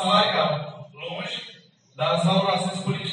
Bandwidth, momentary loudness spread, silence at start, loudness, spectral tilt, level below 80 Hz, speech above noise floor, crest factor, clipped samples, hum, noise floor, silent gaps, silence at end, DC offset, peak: 10 kHz; 16 LU; 0 s; -24 LUFS; -5 dB/octave; -70 dBFS; 29 dB; 18 dB; under 0.1%; none; -51 dBFS; none; 0 s; under 0.1%; -6 dBFS